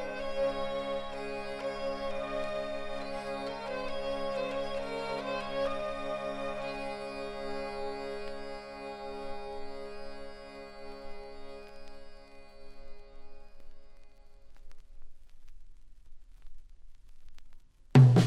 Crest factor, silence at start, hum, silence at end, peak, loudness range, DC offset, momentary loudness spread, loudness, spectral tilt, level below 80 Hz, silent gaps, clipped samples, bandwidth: 24 dB; 0 s; none; 0 s; -10 dBFS; 17 LU; under 0.1%; 16 LU; -34 LUFS; -7.5 dB/octave; -50 dBFS; none; under 0.1%; 10.5 kHz